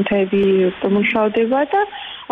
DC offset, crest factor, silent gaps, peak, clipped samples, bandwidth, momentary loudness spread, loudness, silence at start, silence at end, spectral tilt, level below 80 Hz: under 0.1%; 10 dB; none; -8 dBFS; under 0.1%; 4 kHz; 5 LU; -17 LUFS; 0 s; 0.05 s; -8.5 dB/octave; -52 dBFS